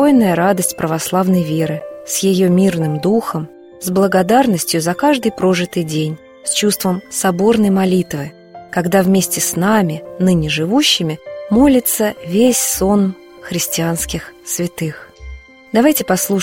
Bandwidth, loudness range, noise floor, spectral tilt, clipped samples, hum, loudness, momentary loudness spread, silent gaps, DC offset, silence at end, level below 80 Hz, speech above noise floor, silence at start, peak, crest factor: 16.5 kHz; 3 LU; -34 dBFS; -4.5 dB/octave; under 0.1%; none; -15 LUFS; 11 LU; none; under 0.1%; 0 s; -42 dBFS; 20 dB; 0 s; 0 dBFS; 14 dB